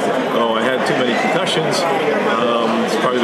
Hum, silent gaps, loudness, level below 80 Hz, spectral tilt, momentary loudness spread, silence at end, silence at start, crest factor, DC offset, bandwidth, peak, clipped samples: none; none; -16 LUFS; -68 dBFS; -4 dB/octave; 1 LU; 0 s; 0 s; 14 dB; under 0.1%; 14.5 kHz; -2 dBFS; under 0.1%